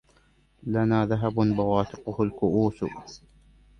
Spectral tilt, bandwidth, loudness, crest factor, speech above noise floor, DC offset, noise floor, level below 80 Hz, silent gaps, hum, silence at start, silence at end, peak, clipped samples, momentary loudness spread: -8.5 dB/octave; 6.6 kHz; -26 LUFS; 18 dB; 37 dB; under 0.1%; -62 dBFS; -52 dBFS; none; none; 0.65 s; 0.6 s; -8 dBFS; under 0.1%; 12 LU